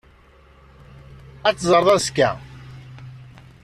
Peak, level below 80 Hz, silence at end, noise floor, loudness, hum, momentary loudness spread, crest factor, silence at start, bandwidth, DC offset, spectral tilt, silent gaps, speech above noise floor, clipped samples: -4 dBFS; -50 dBFS; 0.45 s; -51 dBFS; -18 LUFS; none; 25 LU; 20 dB; 1.45 s; 14 kHz; under 0.1%; -4 dB/octave; none; 33 dB; under 0.1%